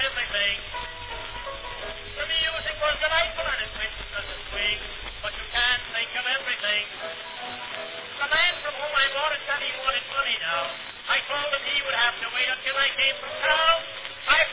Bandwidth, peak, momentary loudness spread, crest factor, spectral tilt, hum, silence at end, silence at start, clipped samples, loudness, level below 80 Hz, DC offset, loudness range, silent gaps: 4 kHz; -6 dBFS; 13 LU; 20 dB; 2.5 dB/octave; none; 0 s; 0 s; under 0.1%; -25 LUFS; -48 dBFS; under 0.1%; 4 LU; none